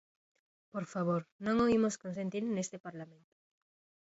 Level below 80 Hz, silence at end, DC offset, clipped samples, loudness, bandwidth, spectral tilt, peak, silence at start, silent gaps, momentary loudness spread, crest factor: -68 dBFS; 0.95 s; under 0.1%; under 0.1%; -34 LUFS; 8 kHz; -6 dB/octave; -20 dBFS; 0.75 s; 1.32-1.39 s, 2.80-2.84 s; 17 LU; 16 dB